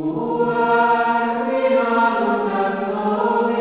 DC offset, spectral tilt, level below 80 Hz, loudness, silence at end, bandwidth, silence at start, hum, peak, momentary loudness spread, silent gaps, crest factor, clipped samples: 0.1%; -9.5 dB/octave; -64 dBFS; -19 LUFS; 0 s; 4 kHz; 0 s; none; -6 dBFS; 5 LU; none; 12 dB; under 0.1%